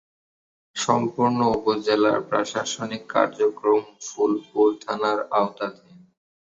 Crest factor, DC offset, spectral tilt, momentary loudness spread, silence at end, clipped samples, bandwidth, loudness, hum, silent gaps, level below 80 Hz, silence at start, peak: 20 dB; under 0.1%; -4.5 dB/octave; 8 LU; 0.75 s; under 0.1%; 8 kHz; -23 LUFS; none; none; -60 dBFS; 0.75 s; -4 dBFS